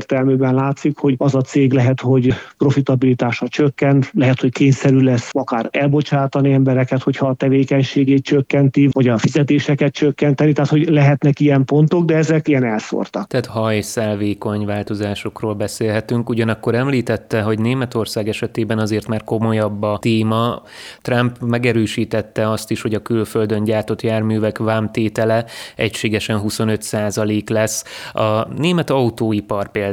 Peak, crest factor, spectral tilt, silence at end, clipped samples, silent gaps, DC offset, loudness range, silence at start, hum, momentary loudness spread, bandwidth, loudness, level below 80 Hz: -2 dBFS; 16 dB; -6.5 dB/octave; 0 s; under 0.1%; none; under 0.1%; 5 LU; 0 s; none; 7 LU; 15.5 kHz; -17 LUFS; -52 dBFS